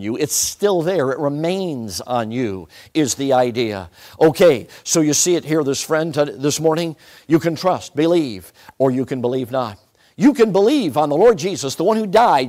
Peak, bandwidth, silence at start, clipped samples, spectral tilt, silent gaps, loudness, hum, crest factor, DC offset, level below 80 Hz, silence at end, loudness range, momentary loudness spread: -4 dBFS; 16 kHz; 0 s; under 0.1%; -4.5 dB/octave; none; -18 LUFS; none; 14 dB; under 0.1%; -54 dBFS; 0 s; 3 LU; 10 LU